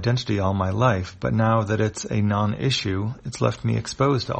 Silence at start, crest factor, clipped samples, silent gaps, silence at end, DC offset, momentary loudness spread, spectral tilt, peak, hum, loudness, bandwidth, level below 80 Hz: 0 s; 16 dB; under 0.1%; none; 0 s; under 0.1%; 5 LU; -6 dB/octave; -6 dBFS; none; -23 LUFS; 8.8 kHz; -48 dBFS